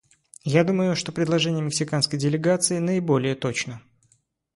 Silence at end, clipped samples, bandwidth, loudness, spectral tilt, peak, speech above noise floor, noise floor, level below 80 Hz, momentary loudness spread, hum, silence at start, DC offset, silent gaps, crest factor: 0.75 s; under 0.1%; 11.5 kHz; -23 LUFS; -5 dB/octave; -6 dBFS; 43 dB; -66 dBFS; -62 dBFS; 7 LU; none; 0.45 s; under 0.1%; none; 18 dB